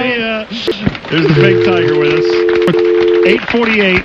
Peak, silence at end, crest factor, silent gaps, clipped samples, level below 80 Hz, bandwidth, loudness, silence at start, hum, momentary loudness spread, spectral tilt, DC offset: 0 dBFS; 0 s; 10 dB; none; under 0.1%; -38 dBFS; 7.2 kHz; -11 LUFS; 0 s; none; 8 LU; -7 dB/octave; under 0.1%